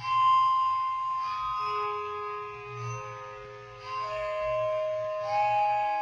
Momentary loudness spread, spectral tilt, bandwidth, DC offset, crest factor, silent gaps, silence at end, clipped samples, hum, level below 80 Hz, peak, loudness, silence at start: 16 LU; -4 dB/octave; 7.4 kHz; under 0.1%; 12 dB; none; 0 s; under 0.1%; none; -62 dBFS; -16 dBFS; -29 LUFS; 0 s